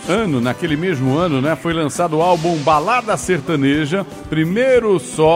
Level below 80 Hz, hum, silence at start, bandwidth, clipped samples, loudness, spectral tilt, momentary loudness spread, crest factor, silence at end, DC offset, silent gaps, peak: -44 dBFS; none; 0 s; 16 kHz; under 0.1%; -17 LUFS; -5.5 dB/octave; 5 LU; 14 dB; 0 s; under 0.1%; none; -2 dBFS